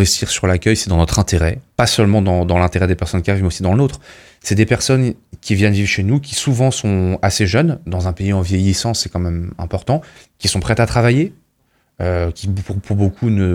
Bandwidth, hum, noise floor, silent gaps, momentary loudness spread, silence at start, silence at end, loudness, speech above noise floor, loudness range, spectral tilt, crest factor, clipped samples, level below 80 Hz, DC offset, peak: 16 kHz; none; -62 dBFS; none; 8 LU; 0 s; 0 s; -16 LUFS; 46 dB; 3 LU; -5 dB/octave; 16 dB; under 0.1%; -32 dBFS; under 0.1%; 0 dBFS